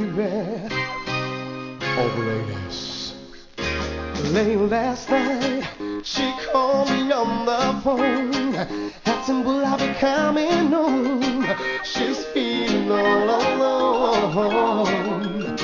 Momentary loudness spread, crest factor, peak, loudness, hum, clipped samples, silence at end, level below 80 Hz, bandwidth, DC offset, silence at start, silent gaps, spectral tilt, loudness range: 9 LU; 16 dB; -6 dBFS; -22 LUFS; none; under 0.1%; 0 s; -46 dBFS; 7.6 kHz; under 0.1%; 0 s; none; -5 dB/octave; 6 LU